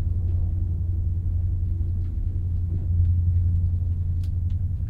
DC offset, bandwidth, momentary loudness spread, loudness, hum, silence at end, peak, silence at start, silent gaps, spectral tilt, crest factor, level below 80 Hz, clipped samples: under 0.1%; 0.9 kHz; 5 LU; -26 LUFS; none; 0 s; -10 dBFS; 0 s; none; -11 dB/octave; 12 dB; -28 dBFS; under 0.1%